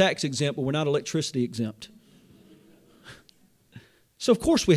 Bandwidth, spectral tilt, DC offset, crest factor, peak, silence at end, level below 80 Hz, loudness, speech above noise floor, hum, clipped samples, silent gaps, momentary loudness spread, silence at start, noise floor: 15.5 kHz; -5 dB/octave; under 0.1%; 20 dB; -8 dBFS; 0 s; -54 dBFS; -26 LUFS; 36 dB; none; under 0.1%; none; 25 LU; 0 s; -60 dBFS